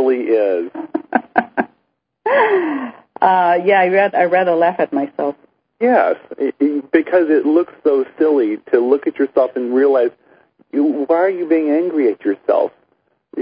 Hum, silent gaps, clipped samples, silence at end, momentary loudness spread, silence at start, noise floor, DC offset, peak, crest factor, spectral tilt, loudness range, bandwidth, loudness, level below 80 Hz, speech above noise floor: none; none; under 0.1%; 0 s; 9 LU; 0 s; -68 dBFS; under 0.1%; 0 dBFS; 16 dB; -10.5 dB/octave; 3 LU; 5.2 kHz; -16 LUFS; -68 dBFS; 53 dB